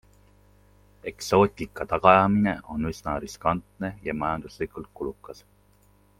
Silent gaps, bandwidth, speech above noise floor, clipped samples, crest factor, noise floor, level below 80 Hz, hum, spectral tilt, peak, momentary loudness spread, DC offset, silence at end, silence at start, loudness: none; 15 kHz; 35 dB; under 0.1%; 24 dB; -60 dBFS; -50 dBFS; 50 Hz at -45 dBFS; -6 dB/octave; -2 dBFS; 17 LU; under 0.1%; 0.85 s; 1.05 s; -25 LUFS